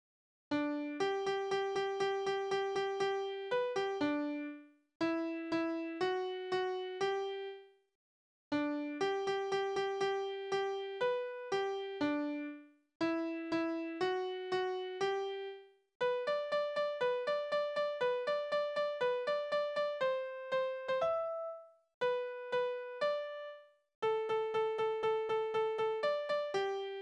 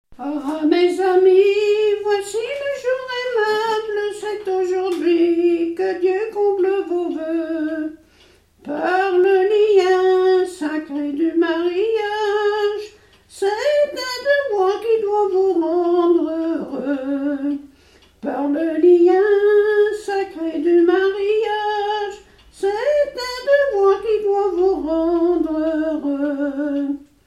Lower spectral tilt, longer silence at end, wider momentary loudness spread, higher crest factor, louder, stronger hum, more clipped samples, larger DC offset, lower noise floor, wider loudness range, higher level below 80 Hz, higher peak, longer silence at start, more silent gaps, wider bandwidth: about the same, -4.5 dB/octave vs -4 dB/octave; second, 0 s vs 0.25 s; second, 5 LU vs 10 LU; about the same, 14 dB vs 14 dB; second, -36 LUFS vs -18 LUFS; neither; neither; neither; first, under -90 dBFS vs -53 dBFS; about the same, 3 LU vs 4 LU; second, -80 dBFS vs -56 dBFS; second, -22 dBFS vs -4 dBFS; first, 0.5 s vs 0.1 s; first, 4.95-5.00 s, 7.95-8.51 s, 12.95-13.00 s, 15.95-16.00 s, 21.94-22.01 s, 23.95-24.02 s vs none; second, 9.8 kHz vs 12 kHz